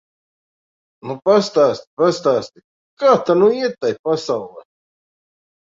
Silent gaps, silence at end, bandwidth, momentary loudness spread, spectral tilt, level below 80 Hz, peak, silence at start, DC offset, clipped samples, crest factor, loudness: 1.87-1.97 s, 2.64-2.97 s, 3.99-4.04 s; 1.05 s; 7.8 kHz; 14 LU; -5.5 dB/octave; -64 dBFS; -2 dBFS; 1.05 s; under 0.1%; under 0.1%; 18 dB; -17 LUFS